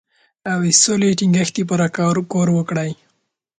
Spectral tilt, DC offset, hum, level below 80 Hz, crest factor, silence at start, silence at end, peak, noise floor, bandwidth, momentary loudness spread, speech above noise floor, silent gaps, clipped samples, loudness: -4 dB/octave; under 0.1%; none; -58 dBFS; 18 dB; 0.45 s; 0.65 s; 0 dBFS; -69 dBFS; 9.4 kHz; 12 LU; 52 dB; none; under 0.1%; -17 LUFS